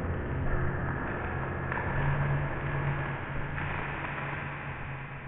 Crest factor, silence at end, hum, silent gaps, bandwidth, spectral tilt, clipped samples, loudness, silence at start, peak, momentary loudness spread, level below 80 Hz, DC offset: 14 dB; 0 s; none; none; 3.9 kHz; -6 dB/octave; under 0.1%; -33 LUFS; 0 s; -18 dBFS; 6 LU; -40 dBFS; 0.2%